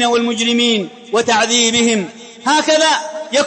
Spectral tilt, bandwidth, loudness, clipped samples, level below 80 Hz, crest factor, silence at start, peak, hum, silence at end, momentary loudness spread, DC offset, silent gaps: -2 dB/octave; 8.8 kHz; -14 LUFS; under 0.1%; -60 dBFS; 12 dB; 0 s; -2 dBFS; none; 0 s; 8 LU; under 0.1%; none